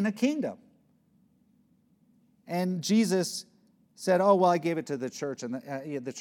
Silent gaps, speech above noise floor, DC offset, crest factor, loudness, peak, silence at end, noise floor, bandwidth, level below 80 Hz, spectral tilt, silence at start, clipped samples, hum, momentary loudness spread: none; 39 dB; under 0.1%; 20 dB; -28 LUFS; -10 dBFS; 0 s; -66 dBFS; 17.5 kHz; -86 dBFS; -5.5 dB/octave; 0 s; under 0.1%; none; 14 LU